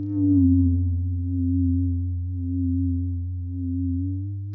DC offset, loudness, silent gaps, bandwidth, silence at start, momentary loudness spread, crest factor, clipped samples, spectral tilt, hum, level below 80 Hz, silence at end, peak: under 0.1%; -24 LUFS; none; 0.9 kHz; 0 s; 10 LU; 12 dB; under 0.1%; -16 dB/octave; none; -30 dBFS; 0 s; -10 dBFS